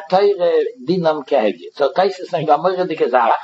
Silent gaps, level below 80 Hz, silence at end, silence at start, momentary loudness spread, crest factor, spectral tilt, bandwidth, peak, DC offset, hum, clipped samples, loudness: none; -76 dBFS; 0 s; 0 s; 6 LU; 16 dB; -6.5 dB/octave; 8 kHz; 0 dBFS; under 0.1%; none; under 0.1%; -17 LUFS